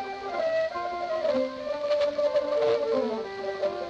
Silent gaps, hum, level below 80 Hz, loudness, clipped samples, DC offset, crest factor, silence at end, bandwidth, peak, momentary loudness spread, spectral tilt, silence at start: none; none; -64 dBFS; -28 LUFS; under 0.1%; under 0.1%; 12 dB; 0 s; 8 kHz; -16 dBFS; 7 LU; -4.5 dB/octave; 0 s